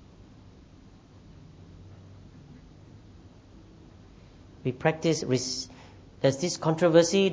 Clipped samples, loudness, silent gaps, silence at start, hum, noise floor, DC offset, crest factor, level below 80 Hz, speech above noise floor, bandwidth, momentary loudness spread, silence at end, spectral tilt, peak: under 0.1%; -26 LUFS; none; 1.8 s; none; -52 dBFS; under 0.1%; 24 dB; -58 dBFS; 28 dB; 8 kHz; 29 LU; 0 s; -5 dB/octave; -6 dBFS